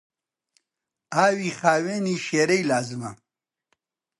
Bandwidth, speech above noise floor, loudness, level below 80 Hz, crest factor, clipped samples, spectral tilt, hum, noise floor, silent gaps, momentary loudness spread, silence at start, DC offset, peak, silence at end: 11.5 kHz; 62 dB; -23 LUFS; -72 dBFS; 22 dB; under 0.1%; -4.5 dB/octave; none; -85 dBFS; none; 11 LU; 1.1 s; under 0.1%; -4 dBFS; 1.05 s